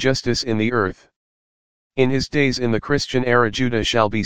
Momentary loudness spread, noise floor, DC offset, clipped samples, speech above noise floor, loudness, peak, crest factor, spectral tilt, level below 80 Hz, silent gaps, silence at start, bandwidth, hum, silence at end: 4 LU; under -90 dBFS; 2%; under 0.1%; over 71 dB; -19 LUFS; 0 dBFS; 18 dB; -5 dB/octave; -42 dBFS; 1.16-1.90 s; 0 s; 15.5 kHz; none; 0 s